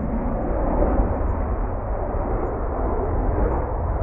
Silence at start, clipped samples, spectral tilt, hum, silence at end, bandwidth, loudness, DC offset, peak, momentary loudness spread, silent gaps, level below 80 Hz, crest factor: 0 s; under 0.1%; -13 dB/octave; none; 0 s; 2.8 kHz; -25 LUFS; under 0.1%; -8 dBFS; 5 LU; none; -24 dBFS; 14 dB